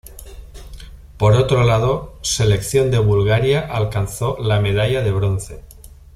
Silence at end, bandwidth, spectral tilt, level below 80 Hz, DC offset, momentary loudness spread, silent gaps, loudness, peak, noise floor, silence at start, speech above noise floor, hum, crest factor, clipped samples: 0.3 s; 14 kHz; -5.5 dB/octave; -36 dBFS; under 0.1%; 8 LU; none; -17 LUFS; -2 dBFS; -36 dBFS; 0.05 s; 20 dB; none; 16 dB; under 0.1%